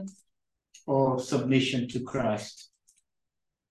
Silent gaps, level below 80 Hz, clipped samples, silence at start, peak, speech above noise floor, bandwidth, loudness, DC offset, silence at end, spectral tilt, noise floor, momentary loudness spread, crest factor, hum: none; -66 dBFS; under 0.1%; 0 s; -12 dBFS; 60 dB; 12.5 kHz; -28 LUFS; under 0.1%; 1.05 s; -6 dB/octave; -87 dBFS; 19 LU; 20 dB; none